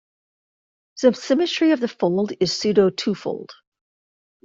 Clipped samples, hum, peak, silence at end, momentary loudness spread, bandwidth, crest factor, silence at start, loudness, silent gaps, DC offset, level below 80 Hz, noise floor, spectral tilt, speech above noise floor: under 0.1%; none; -4 dBFS; 0.9 s; 8 LU; 7.8 kHz; 18 dB; 0.95 s; -20 LUFS; none; under 0.1%; -62 dBFS; under -90 dBFS; -5 dB/octave; over 70 dB